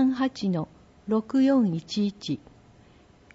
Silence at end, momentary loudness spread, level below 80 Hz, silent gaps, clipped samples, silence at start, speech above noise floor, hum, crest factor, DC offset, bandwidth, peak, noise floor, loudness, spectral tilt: 1 s; 13 LU; -62 dBFS; none; under 0.1%; 0 s; 30 dB; none; 14 dB; under 0.1%; 7.8 kHz; -12 dBFS; -55 dBFS; -26 LUFS; -7 dB/octave